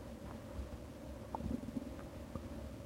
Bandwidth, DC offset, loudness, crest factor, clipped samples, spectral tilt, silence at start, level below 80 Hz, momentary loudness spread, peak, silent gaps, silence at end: 16 kHz; under 0.1%; -47 LUFS; 20 dB; under 0.1%; -7 dB/octave; 0 s; -52 dBFS; 7 LU; -26 dBFS; none; 0 s